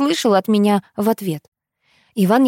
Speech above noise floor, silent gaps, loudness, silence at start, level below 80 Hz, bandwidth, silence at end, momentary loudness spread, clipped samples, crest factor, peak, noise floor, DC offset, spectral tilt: 45 dB; 1.48-1.52 s; -18 LUFS; 0 s; -68 dBFS; 17 kHz; 0 s; 12 LU; under 0.1%; 14 dB; -2 dBFS; -61 dBFS; under 0.1%; -6 dB/octave